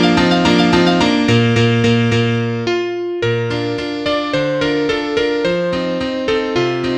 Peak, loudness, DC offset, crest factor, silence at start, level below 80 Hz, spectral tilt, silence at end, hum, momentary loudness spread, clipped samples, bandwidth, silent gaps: 0 dBFS; -15 LUFS; under 0.1%; 14 dB; 0 s; -42 dBFS; -6 dB/octave; 0 s; none; 7 LU; under 0.1%; 10 kHz; none